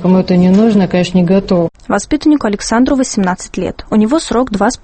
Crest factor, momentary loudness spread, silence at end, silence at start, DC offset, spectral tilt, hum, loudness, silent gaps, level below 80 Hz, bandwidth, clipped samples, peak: 12 dB; 7 LU; 0.1 s; 0 s; under 0.1%; -6 dB/octave; none; -12 LUFS; none; -36 dBFS; 8.8 kHz; under 0.1%; 0 dBFS